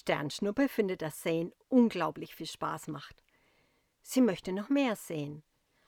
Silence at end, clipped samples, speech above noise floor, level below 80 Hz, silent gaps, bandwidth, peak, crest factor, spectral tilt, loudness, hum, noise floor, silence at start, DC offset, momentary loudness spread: 0.5 s; under 0.1%; 40 dB; -68 dBFS; none; 18 kHz; -14 dBFS; 18 dB; -5.5 dB/octave; -32 LUFS; none; -72 dBFS; 0.05 s; under 0.1%; 15 LU